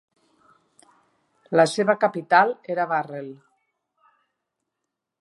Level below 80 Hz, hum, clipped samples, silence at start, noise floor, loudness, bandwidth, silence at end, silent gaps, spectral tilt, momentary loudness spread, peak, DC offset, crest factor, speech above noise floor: -80 dBFS; none; under 0.1%; 1.5 s; -83 dBFS; -21 LUFS; 11.5 kHz; 1.9 s; none; -5 dB/octave; 16 LU; -4 dBFS; under 0.1%; 22 dB; 62 dB